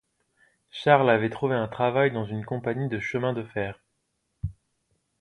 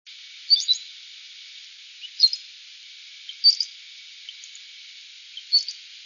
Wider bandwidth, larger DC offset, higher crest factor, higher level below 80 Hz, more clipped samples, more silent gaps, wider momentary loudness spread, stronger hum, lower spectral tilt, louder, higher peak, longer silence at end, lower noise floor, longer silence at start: first, 11 kHz vs 7.4 kHz; neither; about the same, 22 dB vs 22 dB; first, -52 dBFS vs under -90 dBFS; neither; neither; second, 17 LU vs 23 LU; neither; first, -7.5 dB/octave vs 12.5 dB/octave; second, -25 LUFS vs -20 LUFS; about the same, -6 dBFS vs -6 dBFS; first, 0.7 s vs 0.1 s; first, -76 dBFS vs -45 dBFS; first, 0.75 s vs 0.1 s